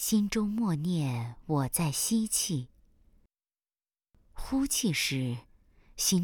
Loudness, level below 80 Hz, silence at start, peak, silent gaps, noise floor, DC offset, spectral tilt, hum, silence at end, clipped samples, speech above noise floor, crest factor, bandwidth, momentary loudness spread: -30 LUFS; -52 dBFS; 0 s; -14 dBFS; none; under -90 dBFS; under 0.1%; -4 dB/octave; none; 0 s; under 0.1%; over 60 dB; 18 dB; over 20 kHz; 9 LU